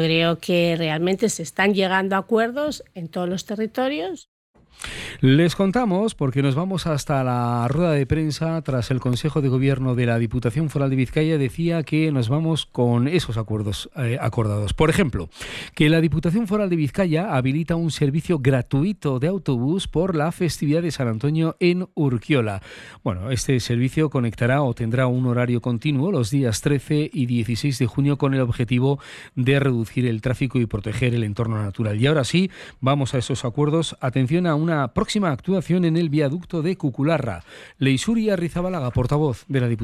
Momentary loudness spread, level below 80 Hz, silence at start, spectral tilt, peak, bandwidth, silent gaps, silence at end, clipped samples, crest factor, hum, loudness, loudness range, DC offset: 6 LU; -44 dBFS; 0 s; -6.5 dB/octave; -6 dBFS; 13.5 kHz; 4.28-4.54 s; 0 s; under 0.1%; 16 dB; none; -22 LUFS; 2 LU; under 0.1%